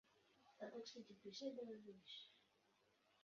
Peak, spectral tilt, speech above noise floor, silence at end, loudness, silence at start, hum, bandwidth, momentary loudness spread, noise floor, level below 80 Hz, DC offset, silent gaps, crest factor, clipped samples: -38 dBFS; -3 dB/octave; 25 dB; 0 s; -56 LUFS; 0.05 s; none; 7.2 kHz; 8 LU; -81 dBFS; under -90 dBFS; under 0.1%; none; 20 dB; under 0.1%